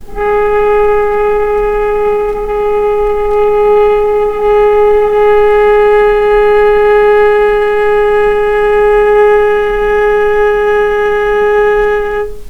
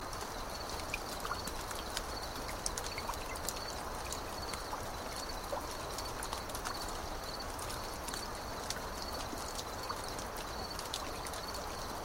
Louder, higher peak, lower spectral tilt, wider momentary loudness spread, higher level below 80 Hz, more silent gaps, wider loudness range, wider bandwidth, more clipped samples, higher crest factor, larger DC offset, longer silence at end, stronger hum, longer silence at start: first, -9 LUFS vs -40 LUFS; first, 0 dBFS vs -14 dBFS; first, -5 dB/octave vs -2.5 dB/octave; first, 5 LU vs 2 LU; first, -28 dBFS vs -50 dBFS; neither; about the same, 3 LU vs 1 LU; second, 6.2 kHz vs 16 kHz; neither; second, 8 dB vs 26 dB; neither; about the same, 0 s vs 0 s; neither; about the same, 0 s vs 0 s